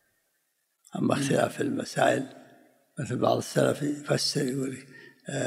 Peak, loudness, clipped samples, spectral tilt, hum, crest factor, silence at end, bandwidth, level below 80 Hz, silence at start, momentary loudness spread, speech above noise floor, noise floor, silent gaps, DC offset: -8 dBFS; -28 LUFS; under 0.1%; -5 dB/octave; none; 22 dB; 0 s; 16 kHz; -72 dBFS; 0.95 s; 15 LU; 48 dB; -75 dBFS; none; under 0.1%